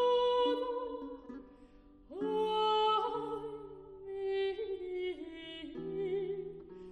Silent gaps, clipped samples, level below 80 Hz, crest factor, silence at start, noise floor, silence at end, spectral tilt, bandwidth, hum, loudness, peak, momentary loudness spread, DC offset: none; under 0.1%; -64 dBFS; 14 dB; 0 s; -59 dBFS; 0 s; -5.5 dB/octave; 9.4 kHz; none; -35 LUFS; -22 dBFS; 19 LU; under 0.1%